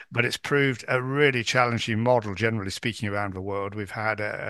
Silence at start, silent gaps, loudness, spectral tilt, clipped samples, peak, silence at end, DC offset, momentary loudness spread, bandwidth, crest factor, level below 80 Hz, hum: 0 s; none; -25 LUFS; -5 dB/octave; under 0.1%; -4 dBFS; 0 s; under 0.1%; 9 LU; 12.5 kHz; 20 dB; -62 dBFS; none